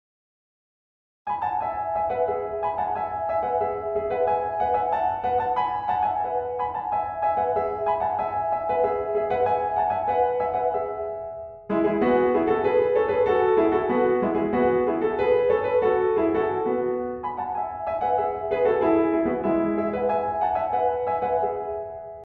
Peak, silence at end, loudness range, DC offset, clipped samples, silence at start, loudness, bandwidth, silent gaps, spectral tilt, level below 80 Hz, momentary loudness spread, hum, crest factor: -8 dBFS; 0 s; 4 LU; under 0.1%; under 0.1%; 1.25 s; -24 LUFS; 4.8 kHz; none; -9 dB/octave; -52 dBFS; 7 LU; none; 16 dB